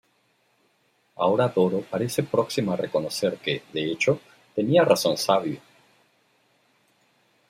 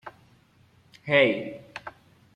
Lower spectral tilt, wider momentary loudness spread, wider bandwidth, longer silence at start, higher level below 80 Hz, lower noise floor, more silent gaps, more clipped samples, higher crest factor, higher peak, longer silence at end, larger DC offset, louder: second, -5 dB/octave vs -6.5 dB/octave; second, 9 LU vs 24 LU; first, 16 kHz vs 9.2 kHz; first, 1.2 s vs 0.05 s; about the same, -68 dBFS vs -70 dBFS; first, -67 dBFS vs -60 dBFS; neither; neither; about the same, 20 dB vs 22 dB; about the same, -6 dBFS vs -8 dBFS; first, 1.9 s vs 0.45 s; neither; about the same, -24 LUFS vs -23 LUFS